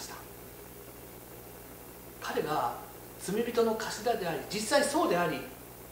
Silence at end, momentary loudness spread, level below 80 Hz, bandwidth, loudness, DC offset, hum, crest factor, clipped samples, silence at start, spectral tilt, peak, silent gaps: 0 s; 19 LU; -60 dBFS; 16 kHz; -31 LUFS; under 0.1%; 60 Hz at -55 dBFS; 20 dB; under 0.1%; 0 s; -3.5 dB/octave; -12 dBFS; none